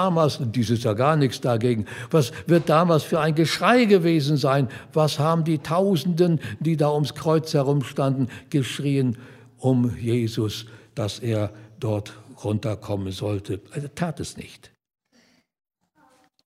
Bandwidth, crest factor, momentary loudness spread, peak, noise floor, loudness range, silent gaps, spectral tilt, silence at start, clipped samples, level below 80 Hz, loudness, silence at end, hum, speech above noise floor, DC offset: 15.5 kHz; 20 dB; 12 LU; -2 dBFS; -61 dBFS; 10 LU; none; -6.5 dB/octave; 0 s; under 0.1%; -60 dBFS; -23 LUFS; 1.9 s; none; 39 dB; under 0.1%